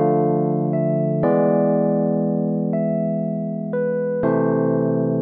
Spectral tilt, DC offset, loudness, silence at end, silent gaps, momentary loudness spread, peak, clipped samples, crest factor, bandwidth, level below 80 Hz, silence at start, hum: -11.5 dB/octave; under 0.1%; -20 LUFS; 0 s; none; 5 LU; -6 dBFS; under 0.1%; 12 dB; 2.8 kHz; -60 dBFS; 0 s; none